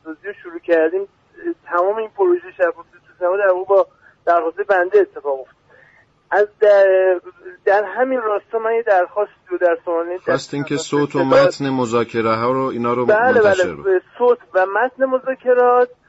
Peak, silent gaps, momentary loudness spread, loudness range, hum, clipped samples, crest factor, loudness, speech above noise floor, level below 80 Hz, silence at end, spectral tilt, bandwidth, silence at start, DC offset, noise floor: -4 dBFS; none; 11 LU; 3 LU; none; under 0.1%; 14 dB; -17 LUFS; 36 dB; -62 dBFS; 0.2 s; -5.5 dB/octave; 8 kHz; 0.05 s; under 0.1%; -53 dBFS